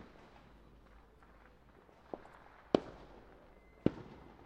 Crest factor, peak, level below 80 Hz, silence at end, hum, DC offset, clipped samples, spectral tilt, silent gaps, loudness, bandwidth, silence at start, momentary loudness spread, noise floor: 34 dB; -10 dBFS; -62 dBFS; 0.1 s; none; under 0.1%; under 0.1%; -7.5 dB/octave; none; -40 LUFS; 9 kHz; 0 s; 27 LU; -62 dBFS